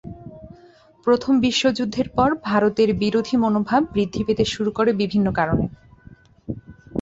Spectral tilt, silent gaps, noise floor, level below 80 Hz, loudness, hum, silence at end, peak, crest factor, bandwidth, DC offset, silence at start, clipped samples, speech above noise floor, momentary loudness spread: -6 dB/octave; none; -51 dBFS; -44 dBFS; -20 LUFS; none; 0 s; -4 dBFS; 16 dB; 8 kHz; under 0.1%; 0.05 s; under 0.1%; 31 dB; 16 LU